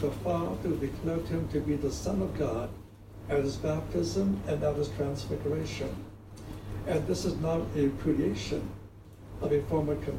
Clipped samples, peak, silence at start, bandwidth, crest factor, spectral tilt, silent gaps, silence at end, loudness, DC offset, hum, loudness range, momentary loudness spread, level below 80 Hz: under 0.1%; -14 dBFS; 0 s; 16 kHz; 16 dB; -7 dB/octave; none; 0 s; -32 LUFS; under 0.1%; none; 2 LU; 15 LU; -46 dBFS